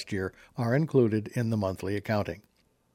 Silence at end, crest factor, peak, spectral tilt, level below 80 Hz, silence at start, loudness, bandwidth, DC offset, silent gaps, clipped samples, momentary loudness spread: 0.55 s; 18 dB; -10 dBFS; -7.5 dB/octave; -60 dBFS; 0 s; -29 LUFS; 16 kHz; under 0.1%; none; under 0.1%; 11 LU